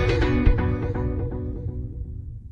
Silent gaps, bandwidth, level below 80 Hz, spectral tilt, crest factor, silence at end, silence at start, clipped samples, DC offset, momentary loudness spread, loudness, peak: none; 7.6 kHz; -26 dBFS; -8 dB/octave; 18 dB; 0 s; 0 s; under 0.1%; under 0.1%; 14 LU; -26 LUFS; -6 dBFS